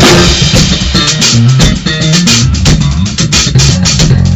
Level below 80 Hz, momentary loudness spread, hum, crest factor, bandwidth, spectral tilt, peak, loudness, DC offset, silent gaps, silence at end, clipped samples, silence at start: -16 dBFS; 3 LU; none; 6 dB; 16 kHz; -4 dB/octave; 0 dBFS; -6 LUFS; under 0.1%; none; 0 s; 2%; 0 s